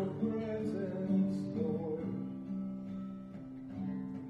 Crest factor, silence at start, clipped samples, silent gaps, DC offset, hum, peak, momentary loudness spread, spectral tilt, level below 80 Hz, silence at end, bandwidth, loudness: 14 dB; 0 s; under 0.1%; none; under 0.1%; none; -22 dBFS; 12 LU; -9.5 dB/octave; -66 dBFS; 0 s; 5.8 kHz; -38 LUFS